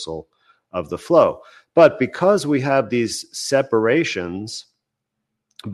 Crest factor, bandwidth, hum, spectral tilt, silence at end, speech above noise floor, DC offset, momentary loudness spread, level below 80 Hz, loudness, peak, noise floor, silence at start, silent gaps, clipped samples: 18 dB; 12.5 kHz; none; -5 dB/octave; 0 s; 61 dB; under 0.1%; 17 LU; -58 dBFS; -18 LUFS; -2 dBFS; -79 dBFS; 0 s; none; under 0.1%